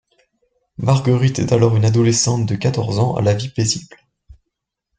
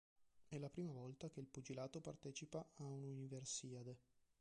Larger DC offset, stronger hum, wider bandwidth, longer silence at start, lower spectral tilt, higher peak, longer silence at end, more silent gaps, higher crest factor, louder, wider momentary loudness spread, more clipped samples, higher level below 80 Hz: neither; neither; second, 9.4 kHz vs 11 kHz; first, 0.8 s vs 0.2 s; about the same, -5.5 dB/octave vs -5 dB/octave; first, -2 dBFS vs -34 dBFS; first, 1.15 s vs 0.2 s; neither; about the same, 16 dB vs 18 dB; first, -17 LUFS vs -53 LUFS; about the same, 5 LU vs 7 LU; neither; first, -48 dBFS vs -82 dBFS